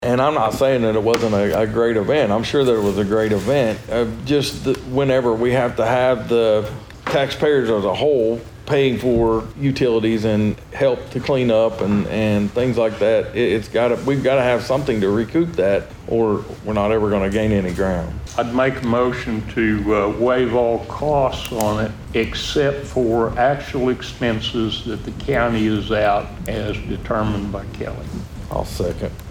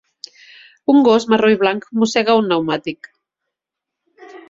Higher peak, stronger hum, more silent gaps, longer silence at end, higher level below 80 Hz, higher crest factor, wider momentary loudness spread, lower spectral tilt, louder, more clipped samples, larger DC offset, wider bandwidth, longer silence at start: about the same, 0 dBFS vs -2 dBFS; neither; neither; about the same, 0 s vs 0.1 s; first, -38 dBFS vs -62 dBFS; about the same, 18 dB vs 16 dB; second, 7 LU vs 19 LU; first, -6.5 dB/octave vs -5 dB/octave; second, -19 LUFS vs -15 LUFS; neither; neither; first, over 20 kHz vs 7.8 kHz; second, 0 s vs 0.9 s